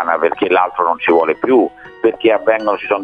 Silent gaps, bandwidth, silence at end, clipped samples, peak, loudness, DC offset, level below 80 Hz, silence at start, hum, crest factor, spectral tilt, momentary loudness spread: none; 4.9 kHz; 0 s; under 0.1%; 0 dBFS; -15 LUFS; under 0.1%; -58 dBFS; 0 s; none; 14 dB; -7 dB/octave; 4 LU